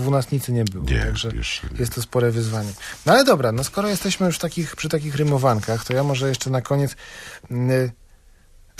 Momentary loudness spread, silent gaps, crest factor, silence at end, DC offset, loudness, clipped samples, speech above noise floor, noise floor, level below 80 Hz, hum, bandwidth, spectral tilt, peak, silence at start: 9 LU; none; 20 dB; 0.85 s; under 0.1%; -21 LUFS; under 0.1%; 29 dB; -50 dBFS; -36 dBFS; none; 15.5 kHz; -5.5 dB/octave; -2 dBFS; 0 s